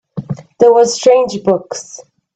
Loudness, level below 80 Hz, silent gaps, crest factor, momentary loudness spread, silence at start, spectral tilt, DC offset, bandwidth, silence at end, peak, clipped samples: -11 LUFS; -56 dBFS; none; 14 dB; 17 LU; 0.15 s; -4.5 dB/octave; under 0.1%; 8.8 kHz; 0.35 s; 0 dBFS; under 0.1%